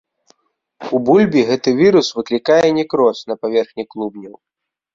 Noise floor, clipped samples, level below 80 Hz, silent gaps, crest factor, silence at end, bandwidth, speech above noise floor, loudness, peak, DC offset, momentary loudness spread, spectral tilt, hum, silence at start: -58 dBFS; under 0.1%; -58 dBFS; none; 14 dB; 0.6 s; 7.6 kHz; 43 dB; -15 LUFS; -2 dBFS; under 0.1%; 14 LU; -5.5 dB/octave; none; 0.8 s